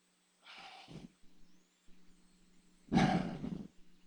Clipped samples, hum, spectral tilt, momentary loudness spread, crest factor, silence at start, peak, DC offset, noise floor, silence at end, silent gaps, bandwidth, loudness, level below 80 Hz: under 0.1%; none; -6.5 dB/octave; 24 LU; 24 dB; 0.45 s; -18 dBFS; under 0.1%; -66 dBFS; 0.1 s; none; 10.5 kHz; -35 LUFS; -60 dBFS